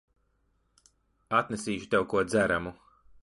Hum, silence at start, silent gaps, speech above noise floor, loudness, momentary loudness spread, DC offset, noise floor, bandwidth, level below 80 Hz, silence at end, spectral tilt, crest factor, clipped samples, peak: none; 1.3 s; none; 44 dB; -28 LUFS; 7 LU; under 0.1%; -72 dBFS; 11.5 kHz; -58 dBFS; 0.5 s; -5 dB/octave; 20 dB; under 0.1%; -10 dBFS